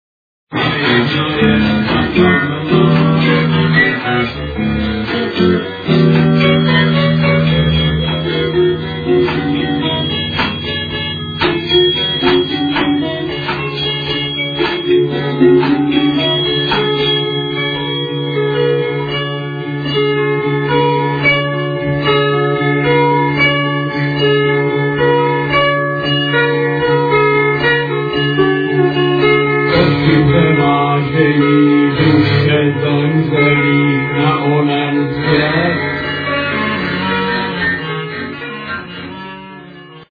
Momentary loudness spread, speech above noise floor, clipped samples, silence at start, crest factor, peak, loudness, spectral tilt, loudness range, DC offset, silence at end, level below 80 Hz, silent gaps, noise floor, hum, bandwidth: 7 LU; 23 dB; under 0.1%; 0.5 s; 14 dB; 0 dBFS; -13 LUFS; -8.5 dB/octave; 4 LU; under 0.1%; 0.05 s; -36 dBFS; none; -35 dBFS; none; 5 kHz